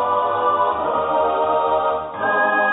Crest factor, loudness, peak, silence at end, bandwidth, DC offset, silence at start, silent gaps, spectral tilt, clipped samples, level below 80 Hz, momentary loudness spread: 12 dB; -19 LUFS; -6 dBFS; 0 s; 4 kHz; under 0.1%; 0 s; none; -9 dB/octave; under 0.1%; -52 dBFS; 3 LU